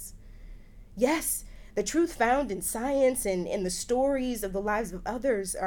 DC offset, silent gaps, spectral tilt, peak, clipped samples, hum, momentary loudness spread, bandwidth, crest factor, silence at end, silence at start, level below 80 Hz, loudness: under 0.1%; none; -4 dB/octave; -10 dBFS; under 0.1%; none; 8 LU; 18.5 kHz; 18 dB; 0 s; 0 s; -46 dBFS; -28 LUFS